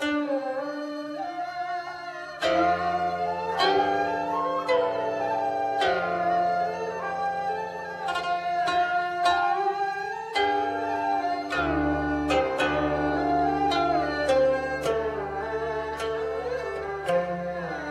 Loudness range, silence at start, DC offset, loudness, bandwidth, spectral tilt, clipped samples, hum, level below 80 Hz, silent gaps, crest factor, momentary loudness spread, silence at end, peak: 3 LU; 0 s; under 0.1%; -26 LUFS; 12.5 kHz; -5 dB/octave; under 0.1%; none; -50 dBFS; none; 16 dB; 8 LU; 0 s; -10 dBFS